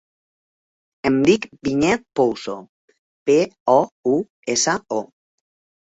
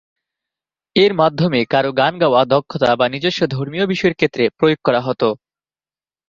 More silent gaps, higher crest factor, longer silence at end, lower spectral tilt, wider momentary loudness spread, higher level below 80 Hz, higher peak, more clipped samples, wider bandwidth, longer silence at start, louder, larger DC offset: first, 2.69-2.88 s, 2.98-3.26 s, 3.60-3.66 s, 3.92-4.03 s, 4.30-4.43 s vs none; about the same, 20 dB vs 16 dB; about the same, 0.85 s vs 0.95 s; second, -4 dB/octave vs -6.5 dB/octave; first, 10 LU vs 6 LU; about the same, -56 dBFS vs -54 dBFS; about the same, -2 dBFS vs 0 dBFS; neither; first, 8.4 kHz vs 7.6 kHz; about the same, 1.05 s vs 0.95 s; second, -20 LUFS vs -16 LUFS; neither